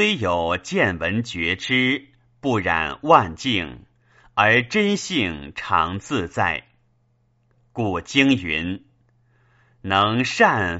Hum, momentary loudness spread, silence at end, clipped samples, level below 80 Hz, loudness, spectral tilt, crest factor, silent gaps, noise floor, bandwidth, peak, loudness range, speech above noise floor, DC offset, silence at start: none; 11 LU; 0 s; under 0.1%; -50 dBFS; -21 LUFS; -3 dB/octave; 22 dB; none; -64 dBFS; 8 kHz; 0 dBFS; 4 LU; 43 dB; under 0.1%; 0 s